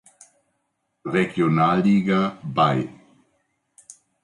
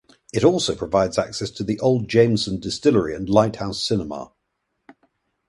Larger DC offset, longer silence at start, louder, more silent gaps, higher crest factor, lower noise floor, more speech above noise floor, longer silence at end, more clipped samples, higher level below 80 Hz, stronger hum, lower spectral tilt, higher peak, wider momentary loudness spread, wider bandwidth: neither; first, 1.05 s vs 0.35 s; about the same, -21 LUFS vs -21 LUFS; neither; about the same, 16 dB vs 20 dB; about the same, -74 dBFS vs -75 dBFS; about the same, 54 dB vs 55 dB; about the same, 1.35 s vs 1.25 s; neither; second, -60 dBFS vs -48 dBFS; neither; first, -7 dB/octave vs -5.5 dB/octave; second, -8 dBFS vs -2 dBFS; about the same, 8 LU vs 9 LU; about the same, 11 kHz vs 11.5 kHz